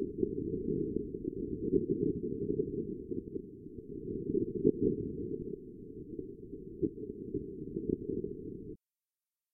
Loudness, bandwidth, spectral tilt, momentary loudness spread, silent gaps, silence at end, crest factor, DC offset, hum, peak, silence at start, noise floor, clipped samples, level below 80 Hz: -37 LUFS; 0.5 kHz; 1 dB/octave; 15 LU; none; 0.75 s; 24 dB; under 0.1%; none; -12 dBFS; 0 s; under -90 dBFS; under 0.1%; -54 dBFS